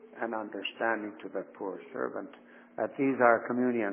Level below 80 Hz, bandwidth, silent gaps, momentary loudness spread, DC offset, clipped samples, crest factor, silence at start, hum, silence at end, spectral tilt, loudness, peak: -86 dBFS; 3.5 kHz; none; 15 LU; under 0.1%; under 0.1%; 22 dB; 0.05 s; none; 0 s; -3.5 dB/octave; -31 LUFS; -10 dBFS